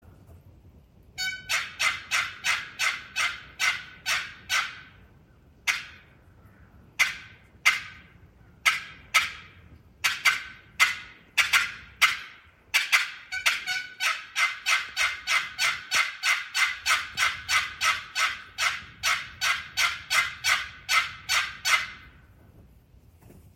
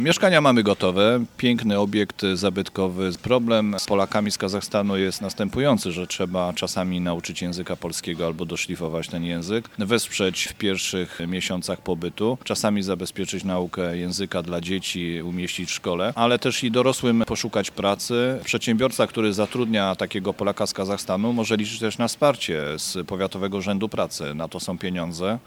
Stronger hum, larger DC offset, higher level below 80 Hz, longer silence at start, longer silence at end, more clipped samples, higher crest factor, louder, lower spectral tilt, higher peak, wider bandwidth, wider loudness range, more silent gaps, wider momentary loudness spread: neither; neither; second, -60 dBFS vs -54 dBFS; first, 0.3 s vs 0 s; about the same, 0.15 s vs 0.05 s; neither; about the same, 24 dB vs 22 dB; about the same, -25 LUFS vs -24 LUFS; second, 1.5 dB/octave vs -4.5 dB/octave; about the same, -4 dBFS vs -2 dBFS; second, 16.5 kHz vs 19 kHz; about the same, 5 LU vs 4 LU; neither; about the same, 9 LU vs 8 LU